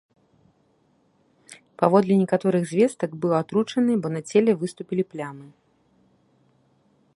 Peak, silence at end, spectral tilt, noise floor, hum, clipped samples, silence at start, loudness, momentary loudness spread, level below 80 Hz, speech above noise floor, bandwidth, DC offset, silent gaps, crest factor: -2 dBFS; 1.7 s; -7 dB/octave; -64 dBFS; none; under 0.1%; 1.5 s; -23 LUFS; 9 LU; -70 dBFS; 42 dB; 11.5 kHz; under 0.1%; none; 22 dB